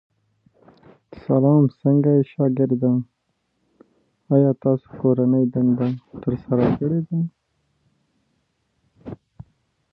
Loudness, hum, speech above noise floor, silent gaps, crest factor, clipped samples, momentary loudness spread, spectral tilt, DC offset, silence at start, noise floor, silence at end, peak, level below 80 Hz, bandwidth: -20 LUFS; none; 53 dB; none; 18 dB; under 0.1%; 14 LU; -13 dB/octave; under 0.1%; 1.15 s; -72 dBFS; 0.8 s; -4 dBFS; -54 dBFS; 4.3 kHz